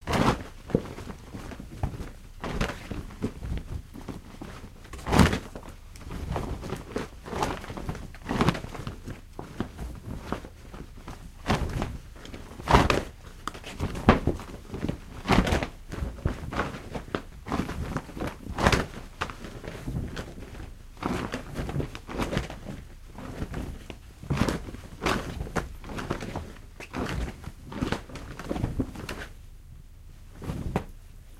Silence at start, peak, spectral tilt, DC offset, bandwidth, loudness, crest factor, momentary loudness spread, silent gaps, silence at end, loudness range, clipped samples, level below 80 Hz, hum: 0 s; -2 dBFS; -5.5 dB/octave; under 0.1%; 16 kHz; -31 LUFS; 30 dB; 19 LU; none; 0 s; 8 LU; under 0.1%; -38 dBFS; none